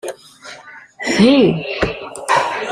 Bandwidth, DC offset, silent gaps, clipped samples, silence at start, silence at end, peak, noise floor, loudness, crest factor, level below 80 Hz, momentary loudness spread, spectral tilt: 13.5 kHz; under 0.1%; none; under 0.1%; 0.05 s; 0 s; -2 dBFS; -38 dBFS; -15 LUFS; 16 dB; -42 dBFS; 24 LU; -5 dB/octave